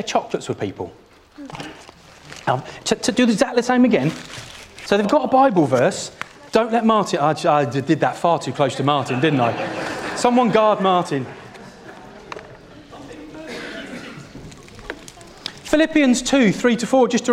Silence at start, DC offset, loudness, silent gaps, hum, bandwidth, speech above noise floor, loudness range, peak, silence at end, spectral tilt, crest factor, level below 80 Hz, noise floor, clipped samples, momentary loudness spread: 0 s; under 0.1%; -18 LUFS; none; none; 14 kHz; 26 dB; 17 LU; -2 dBFS; 0 s; -5 dB/octave; 18 dB; -52 dBFS; -44 dBFS; under 0.1%; 22 LU